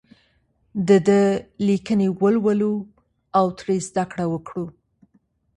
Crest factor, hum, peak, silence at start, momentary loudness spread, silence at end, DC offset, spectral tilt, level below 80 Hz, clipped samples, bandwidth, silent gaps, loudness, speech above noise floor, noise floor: 18 dB; none; -4 dBFS; 0.75 s; 14 LU; 0.9 s; under 0.1%; -7 dB/octave; -58 dBFS; under 0.1%; 11 kHz; none; -21 LUFS; 44 dB; -64 dBFS